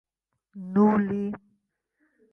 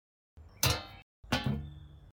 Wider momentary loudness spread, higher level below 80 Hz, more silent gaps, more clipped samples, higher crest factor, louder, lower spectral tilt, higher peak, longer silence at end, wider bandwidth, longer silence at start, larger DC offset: about the same, 21 LU vs 21 LU; second, -64 dBFS vs -48 dBFS; second, none vs 1.02-1.23 s; neither; about the same, 18 dB vs 22 dB; first, -24 LUFS vs -33 LUFS; first, -10.5 dB/octave vs -3.5 dB/octave; first, -10 dBFS vs -14 dBFS; first, 0.95 s vs 0.05 s; second, 3 kHz vs 18 kHz; first, 0.55 s vs 0.35 s; neither